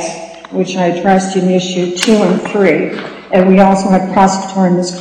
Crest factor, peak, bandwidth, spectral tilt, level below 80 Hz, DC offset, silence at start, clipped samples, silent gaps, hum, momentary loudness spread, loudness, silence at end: 12 dB; 0 dBFS; 11.5 kHz; -5.5 dB/octave; -48 dBFS; under 0.1%; 0 s; under 0.1%; none; none; 11 LU; -12 LUFS; 0 s